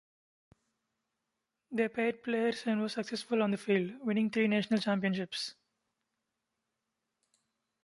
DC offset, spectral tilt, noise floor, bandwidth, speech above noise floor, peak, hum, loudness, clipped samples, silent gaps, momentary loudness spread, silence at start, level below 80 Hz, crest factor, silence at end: under 0.1%; -5.5 dB/octave; -86 dBFS; 11.5 kHz; 54 dB; -16 dBFS; none; -33 LUFS; under 0.1%; none; 8 LU; 1.7 s; -80 dBFS; 18 dB; 2.3 s